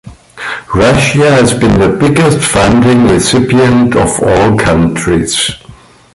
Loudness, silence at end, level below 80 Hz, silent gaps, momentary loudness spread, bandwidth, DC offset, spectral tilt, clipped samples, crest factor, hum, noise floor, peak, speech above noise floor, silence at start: -8 LUFS; 0.45 s; -28 dBFS; none; 7 LU; 11.5 kHz; under 0.1%; -5 dB/octave; under 0.1%; 8 dB; none; -36 dBFS; 0 dBFS; 29 dB; 0.05 s